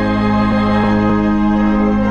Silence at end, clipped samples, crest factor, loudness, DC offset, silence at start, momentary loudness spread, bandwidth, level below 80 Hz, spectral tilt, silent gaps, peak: 0 s; under 0.1%; 10 dB; -14 LUFS; under 0.1%; 0 s; 1 LU; 6.8 kHz; -28 dBFS; -8.5 dB/octave; none; -2 dBFS